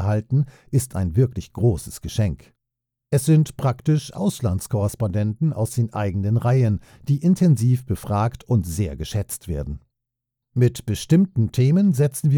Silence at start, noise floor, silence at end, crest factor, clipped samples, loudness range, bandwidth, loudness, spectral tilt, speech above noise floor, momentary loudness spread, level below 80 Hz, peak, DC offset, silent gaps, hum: 0 s; -83 dBFS; 0 s; 16 dB; under 0.1%; 3 LU; 19.5 kHz; -22 LUFS; -7.5 dB/octave; 63 dB; 10 LU; -42 dBFS; -6 dBFS; under 0.1%; none; none